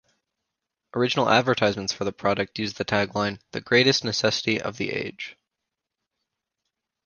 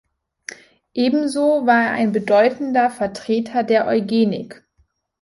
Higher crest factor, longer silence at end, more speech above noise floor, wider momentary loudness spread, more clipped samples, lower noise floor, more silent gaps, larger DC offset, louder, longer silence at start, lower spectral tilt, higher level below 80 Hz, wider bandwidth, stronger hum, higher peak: first, 24 dB vs 16 dB; first, 1.75 s vs 0.7 s; first, 60 dB vs 46 dB; second, 12 LU vs 19 LU; neither; first, -85 dBFS vs -63 dBFS; neither; neither; second, -24 LUFS vs -18 LUFS; first, 0.95 s vs 0.5 s; second, -4 dB/octave vs -5.5 dB/octave; about the same, -58 dBFS vs -62 dBFS; second, 10 kHz vs 11.5 kHz; neither; about the same, -2 dBFS vs -4 dBFS